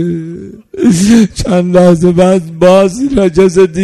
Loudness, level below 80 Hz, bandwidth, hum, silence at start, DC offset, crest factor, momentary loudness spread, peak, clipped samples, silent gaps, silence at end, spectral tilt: -8 LUFS; -32 dBFS; 12.5 kHz; none; 0 s; under 0.1%; 8 dB; 12 LU; 0 dBFS; 2%; none; 0 s; -6.5 dB/octave